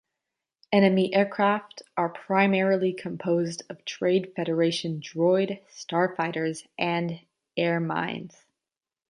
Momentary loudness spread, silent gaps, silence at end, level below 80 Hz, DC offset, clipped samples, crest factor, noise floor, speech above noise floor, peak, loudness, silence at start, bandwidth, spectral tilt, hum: 12 LU; none; 0.8 s; -74 dBFS; under 0.1%; under 0.1%; 20 dB; under -90 dBFS; over 65 dB; -6 dBFS; -26 LUFS; 0.7 s; 10.5 kHz; -6 dB/octave; none